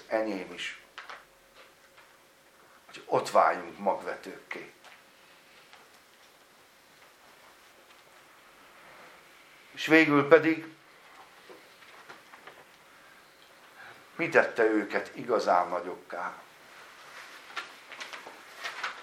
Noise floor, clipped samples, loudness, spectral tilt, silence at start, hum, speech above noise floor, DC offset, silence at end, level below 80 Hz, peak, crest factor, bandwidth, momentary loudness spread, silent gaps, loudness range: -59 dBFS; under 0.1%; -28 LUFS; -5 dB/octave; 0.1 s; none; 32 dB; under 0.1%; 0 s; -80 dBFS; -4 dBFS; 28 dB; 16 kHz; 29 LU; none; 15 LU